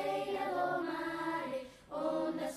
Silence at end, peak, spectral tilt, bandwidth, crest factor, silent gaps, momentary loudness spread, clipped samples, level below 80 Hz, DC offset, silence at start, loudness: 0 s; -24 dBFS; -5 dB/octave; 15 kHz; 14 dB; none; 7 LU; under 0.1%; -70 dBFS; under 0.1%; 0 s; -37 LUFS